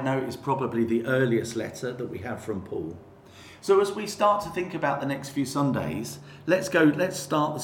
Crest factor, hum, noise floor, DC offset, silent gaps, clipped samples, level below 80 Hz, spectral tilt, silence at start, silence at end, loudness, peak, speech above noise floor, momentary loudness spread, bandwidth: 18 dB; none; -49 dBFS; under 0.1%; none; under 0.1%; -62 dBFS; -5.5 dB/octave; 0 s; 0 s; -27 LUFS; -8 dBFS; 23 dB; 12 LU; 18.5 kHz